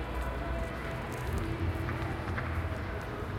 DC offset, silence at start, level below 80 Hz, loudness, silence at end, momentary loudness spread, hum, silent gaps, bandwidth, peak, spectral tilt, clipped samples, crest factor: under 0.1%; 0 s; -40 dBFS; -36 LUFS; 0 s; 3 LU; none; none; 16.5 kHz; -18 dBFS; -6.5 dB/octave; under 0.1%; 16 dB